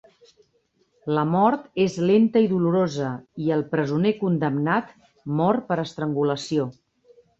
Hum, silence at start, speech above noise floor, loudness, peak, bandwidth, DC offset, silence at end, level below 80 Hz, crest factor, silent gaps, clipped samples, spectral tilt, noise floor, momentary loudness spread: none; 1.05 s; 45 dB; -23 LUFS; -6 dBFS; 8 kHz; under 0.1%; 0.65 s; -64 dBFS; 18 dB; none; under 0.1%; -7.5 dB/octave; -67 dBFS; 9 LU